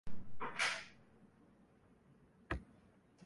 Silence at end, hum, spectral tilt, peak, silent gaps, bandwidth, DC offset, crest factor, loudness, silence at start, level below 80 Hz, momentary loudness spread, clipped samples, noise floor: 0.6 s; none; -2.5 dB/octave; -24 dBFS; none; 11.5 kHz; under 0.1%; 20 dB; -42 LUFS; 0.05 s; -60 dBFS; 24 LU; under 0.1%; -68 dBFS